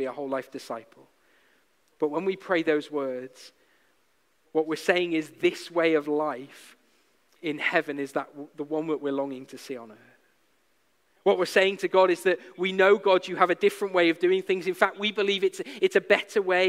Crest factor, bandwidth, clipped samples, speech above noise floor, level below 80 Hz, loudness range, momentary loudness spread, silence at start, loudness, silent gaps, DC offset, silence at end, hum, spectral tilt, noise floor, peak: 24 dB; 15 kHz; under 0.1%; 44 dB; -78 dBFS; 8 LU; 16 LU; 0 s; -25 LUFS; none; under 0.1%; 0 s; none; -4.5 dB/octave; -70 dBFS; -4 dBFS